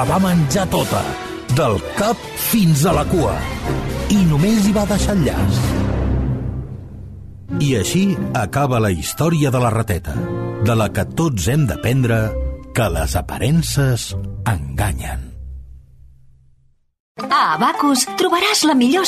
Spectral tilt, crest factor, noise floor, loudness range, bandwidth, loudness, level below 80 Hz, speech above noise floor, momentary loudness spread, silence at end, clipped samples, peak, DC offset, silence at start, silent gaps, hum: -5.5 dB/octave; 14 dB; -55 dBFS; 5 LU; 14 kHz; -18 LUFS; -30 dBFS; 38 dB; 12 LU; 0 s; under 0.1%; -4 dBFS; under 0.1%; 0 s; 17.00-17.15 s; none